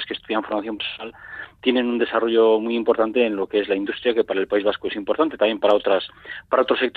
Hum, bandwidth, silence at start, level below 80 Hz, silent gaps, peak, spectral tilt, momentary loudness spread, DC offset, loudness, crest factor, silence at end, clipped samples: none; 4.7 kHz; 0 s; -60 dBFS; none; -4 dBFS; -6.5 dB/octave; 10 LU; under 0.1%; -21 LUFS; 16 dB; 0.05 s; under 0.1%